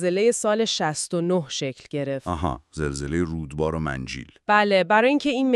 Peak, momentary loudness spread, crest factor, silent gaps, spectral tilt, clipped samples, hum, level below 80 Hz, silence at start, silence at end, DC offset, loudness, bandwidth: -4 dBFS; 11 LU; 18 dB; none; -4.5 dB/octave; under 0.1%; none; -44 dBFS; 0 s; 0 s; under 0.1%; -23 LUFS; 12.5 kHz